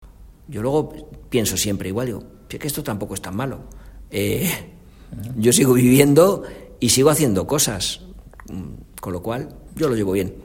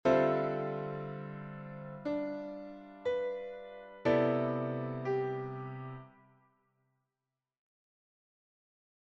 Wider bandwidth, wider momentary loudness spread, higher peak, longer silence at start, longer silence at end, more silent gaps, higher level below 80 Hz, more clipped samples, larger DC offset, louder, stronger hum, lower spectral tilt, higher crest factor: first, 16.5 kHz vs 7.4 kHz; first, 21 LU vs 16 LU; first, 0 dBFS vs -16 dBFS; about the same, 0 s vs 0.05 s; second, 0 s vs 2.95 s; neither; first, -44 dBFS vs -70 dBFS; neither; neither; first, -19 LUFS vs -35 LUFS; neither; second, -4.5 dB/octave vs -8.5 dB/octave; about the same, 20 dB vs 22 dB